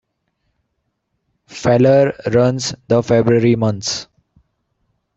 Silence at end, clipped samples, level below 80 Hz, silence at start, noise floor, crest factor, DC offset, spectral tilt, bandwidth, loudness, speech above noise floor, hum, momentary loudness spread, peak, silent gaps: 1.15 s; under 0.1%; -50 dBFS; 1.5 s; -71 dBFS; 16 dB; under 0.1%; -6 dB/octave; 8.2 kHz; -15 LUFS; 57 dB; none; 11 LU; 0 dBFS; none